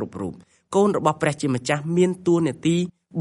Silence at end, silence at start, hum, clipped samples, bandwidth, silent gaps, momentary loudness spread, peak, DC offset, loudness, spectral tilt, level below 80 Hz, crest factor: 0 s; 0 s; none; under 0.1%; 11.5 kHz; none; 10 LU; -4 dBFS; under 0.1%; -22 LUFS; -6 dB/octave; -60 dBFS; 18 dB